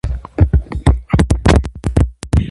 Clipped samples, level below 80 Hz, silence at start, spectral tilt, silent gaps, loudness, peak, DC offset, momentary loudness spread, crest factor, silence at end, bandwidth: under 0.1%; -18 dBFS; 0.05 s; -7 dB/octave; none; -16 LUFS; 0 dBFS; under 0.1%; 5 LU; 14 dB; 0 s; 11.5 kHz